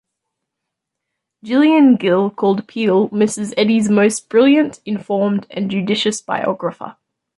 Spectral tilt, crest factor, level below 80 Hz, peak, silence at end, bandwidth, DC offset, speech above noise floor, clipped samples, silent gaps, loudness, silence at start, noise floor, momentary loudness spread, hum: -5 dB/octave; 14 dB; -62 dBFS; -2 dBFS; 0.45 s; 11.5 kHz; under 0.1%; 64 dB; under 0.1%; none; -16 LUFS; 1.45 s; -80 dBFS; 9 LU; none